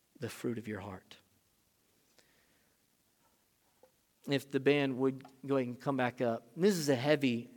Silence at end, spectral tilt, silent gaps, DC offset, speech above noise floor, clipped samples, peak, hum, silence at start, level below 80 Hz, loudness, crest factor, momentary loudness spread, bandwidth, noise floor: 0.1 s; -5.5 dB/octave; none; under 0.1%; 40 dB; under 0.1%; -14 dBFS; none; 0.2 s; -82 dBFS; -33 LUFS; 22 dB; 15 LU; 18.5 kHz; -74 dBFS